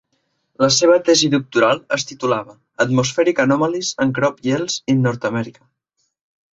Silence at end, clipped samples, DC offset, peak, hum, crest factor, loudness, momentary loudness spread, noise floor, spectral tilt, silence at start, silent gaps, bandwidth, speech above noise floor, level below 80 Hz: 1.05 s; under 0.1%; under 0.1%; -2 dBFS; none; 16 dB; -17 LUFS; 10 LU; -69 dBFS; -4 dB/octave; 0.6 s; none; 8 kHz; 51 dB; -58 dBFS